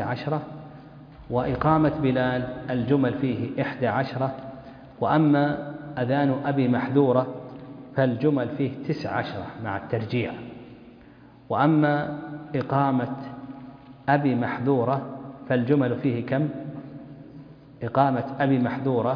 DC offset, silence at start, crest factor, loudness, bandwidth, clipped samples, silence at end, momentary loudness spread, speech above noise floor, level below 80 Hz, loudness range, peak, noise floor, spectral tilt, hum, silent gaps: under 0.1%; 0 s; 20 dB; -25 LUFS; 5.2 kHz; under 0.1%; 0 s; 19 LU; 26 dB; -54 dBFS; 4 LU; -4 dBFS; -49 dBFS; -10 dB/octave; none; none